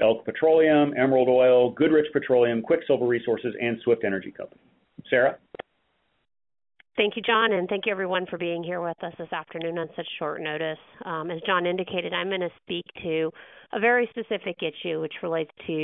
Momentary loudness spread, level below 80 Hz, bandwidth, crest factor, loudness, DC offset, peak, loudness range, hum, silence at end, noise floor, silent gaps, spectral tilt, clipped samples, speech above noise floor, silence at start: 13 LU; -68 dBFS; 4 kHz; 18 dB; -25 LUFS; under 0.1%; -8 dBFS; 8 LU; none; 0 s; -72 dBFS; none; -9.5 dB/octave; under 0.1%; 47 dB; 0 s